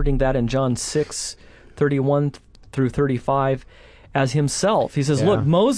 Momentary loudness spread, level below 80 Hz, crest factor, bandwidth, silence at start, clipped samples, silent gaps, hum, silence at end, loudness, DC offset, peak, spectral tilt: 9 LU; -34 dBFS; 16 dB; 11 kHz; 0 s; under 0.1%; none; none; 0 s; -21 LUFS; under 0.1%; -6 dBFS; -6 dB/octave